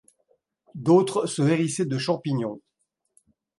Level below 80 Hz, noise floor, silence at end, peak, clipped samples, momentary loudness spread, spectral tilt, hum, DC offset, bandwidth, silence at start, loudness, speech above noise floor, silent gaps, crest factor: -70 dBFS; -76 dBFS; 1 s; -6 dBFS; under 0.1%; 13 LU; -6 dB/octave; none; under 0.1%; 11.5 kHz; 0.75 s; -24 LUFS; 53 dB; none; 20 dB